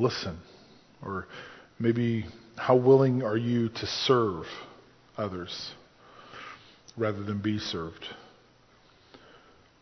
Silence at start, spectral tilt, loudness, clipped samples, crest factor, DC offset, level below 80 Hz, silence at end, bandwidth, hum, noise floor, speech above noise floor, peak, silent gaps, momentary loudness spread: 0 s; -6.5 dB/octave; -28 LUFS; under 0.1%; 22 dB; under 0.1%; -58 dBFS; 0.65 s; 6.4 kHz; none; -60 dBFS; 32 dB; -8 dBFS; none; 23 LU